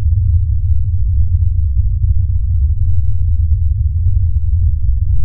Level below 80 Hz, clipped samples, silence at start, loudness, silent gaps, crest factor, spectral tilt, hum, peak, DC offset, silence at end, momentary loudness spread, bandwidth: -14 dBFS; under 0.1%; 0 s; -16 LUFS; none; 10 dB; -22.5 dB/octave; none; -2 dBFS; under 0.1%; 0 s; 2 LU; 0.3 kHz